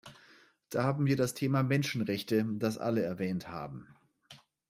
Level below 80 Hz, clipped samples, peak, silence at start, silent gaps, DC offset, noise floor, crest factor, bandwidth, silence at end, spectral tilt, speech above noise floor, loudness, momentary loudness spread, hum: -68 dBFS; under 0.1%; -16 dBFS; 0.05 s; none; under 0.1%; -62 dBFS; 18 dB; 16 kHz; 0.35 s; -6.5 dB/octave; 30 dB; -32 LUFS; 11 LU; none